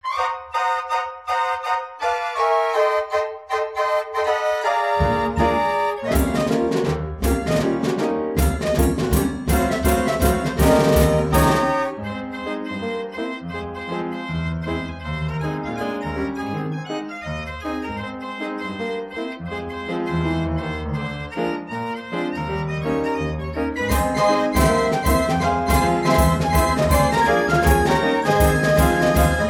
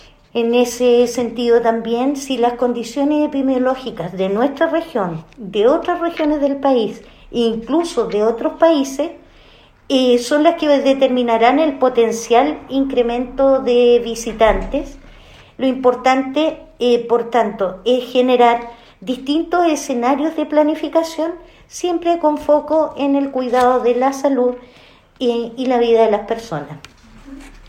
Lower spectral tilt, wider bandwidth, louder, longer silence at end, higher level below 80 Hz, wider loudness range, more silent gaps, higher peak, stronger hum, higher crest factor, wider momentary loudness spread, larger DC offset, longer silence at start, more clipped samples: about the same, -5.5 dB/octave vs -4.5 dB/octave; about the same, 17 kHz vs 15.5 kHz; second, -21 LUFS vs -16 LUFS; about the same, 0 s vs 0.1 s; first, -30 dBFS vs -42 dBFS; first, 9 LU vs 3 LU; neither; second, -4 dBFS vs 0 dBFS; neither; about the same, 18 dB vs 16 dB; about the same, 11 LU vs 10 LU; neither; second, 0.05 s vs 0.35 s; neither